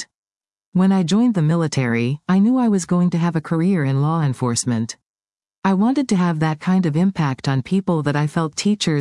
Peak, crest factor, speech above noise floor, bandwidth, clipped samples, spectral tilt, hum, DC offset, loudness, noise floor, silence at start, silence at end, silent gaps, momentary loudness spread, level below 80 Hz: -4 dBFS; 14 dB; over 72 dB; 11.5 kHz; under 0.1%; -6 dB/octave; none; under 0.1%; -19 LUFS; under -90 dBFS; 0 s; 0 s; 0.15-0.23 s, 0.66-0.72 s, 5.06-5.14 s, 5.58-5.62 s; 5 LU; -60 dBFS